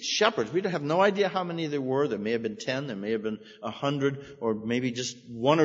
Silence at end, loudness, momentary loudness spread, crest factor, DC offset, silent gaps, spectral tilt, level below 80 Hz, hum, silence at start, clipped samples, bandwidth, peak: 0 s; -28 LUFS; 9 LU; 22 dB; under 0.1%; none; -5 dB/octave; -70 dBFS; none; 0 s; under 0.1%; 8 kHz; -6 dBFS